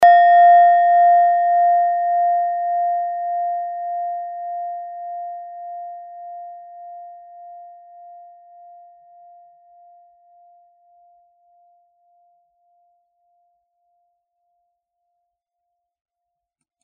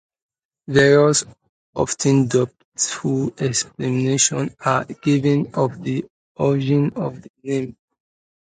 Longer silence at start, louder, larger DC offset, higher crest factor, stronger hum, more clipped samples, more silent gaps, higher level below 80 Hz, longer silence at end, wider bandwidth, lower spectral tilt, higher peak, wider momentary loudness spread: second, 0 s vs 0.7 s; first, -16 LUFS vs -20 LUFS; neither; about the same, 18 dB vs 20 dB; neither; neither; second, none vs 1.49-1.73 s, 2.65-2.72 s, 6.10-6.35 s, 7.30-7.34 s; second, -76 dBFS vs -56 dBFS; first, 9.15 s vs 0.75 s; second, 5.2 kHz vs 9.6 kHz; second, 1.5 dB/octave vs -5 dB/octave; about the same, -2 dBFS vs 0 dBFS; first, 27 LU vs 12 LU